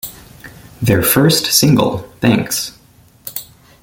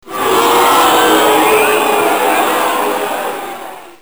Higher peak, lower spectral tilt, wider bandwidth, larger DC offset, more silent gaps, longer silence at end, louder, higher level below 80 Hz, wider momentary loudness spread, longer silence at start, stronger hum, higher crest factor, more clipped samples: about the same, 0 dBFS vs -2 dBFS; first, -4 dB/octave vs -2 dB/octave; second, 17 kHz vs over 20 kHz; second, under 0.1% vs 0.8%; neither; first, 0.4 s vs 0.1 s; about the same, -13 LUFS vs -11 LUFS; first, -44 dBFS vs -52 dBFS; first, 17 LU vs 13 LU; about the same, 0.05 s vs 0.05 s; neither; first, 16 dB vs 10 dB; neither